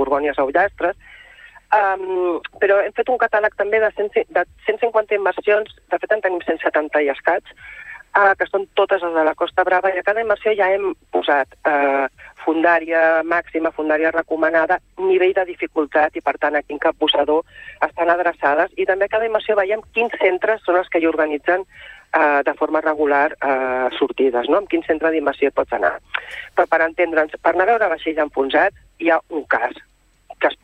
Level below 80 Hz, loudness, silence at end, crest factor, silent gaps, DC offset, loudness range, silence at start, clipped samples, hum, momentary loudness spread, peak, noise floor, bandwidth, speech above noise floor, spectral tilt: -54 dBFS; -18 LUFS; 0.1 s; 16 dB; none; under 0.1%; 2 LU; 0 s; under 0.1%; none; 6 LU; -2 dBFS; -45 dBFS; 8.4 kHz; 26 dB; -5.5 dB/octave